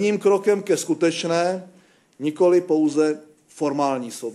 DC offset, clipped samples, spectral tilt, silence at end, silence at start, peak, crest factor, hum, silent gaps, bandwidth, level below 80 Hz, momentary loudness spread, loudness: under 0.1%; under 0.1%; -5 dB/octave; 0 s; 0 s; -6 dBFS; 14 dB; none; none; 13 kHz; -76 dBFS; 10 LU; -21 LUFS